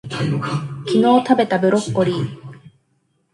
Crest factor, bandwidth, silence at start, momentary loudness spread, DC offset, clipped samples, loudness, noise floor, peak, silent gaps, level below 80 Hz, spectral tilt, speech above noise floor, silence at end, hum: 18 dB; 11.5 kHz; 0.05 s; 11 LU; under 0.1%; under 0.1%; -18 LUFS; -65 dBFS; -2 dBFS; none; -58 dBFS; -6.5 dB/octave; 48 dB; 0.75 s; none